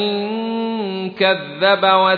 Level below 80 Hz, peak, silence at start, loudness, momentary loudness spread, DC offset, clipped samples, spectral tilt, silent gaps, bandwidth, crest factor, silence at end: -68 dBFS; -2 dBFS; 0 s; -18 LUFS; 9 LU; under 0.1%; under 0.1%; -7 dB/octave; none; 4.9 kHz; 16 dB; 0 s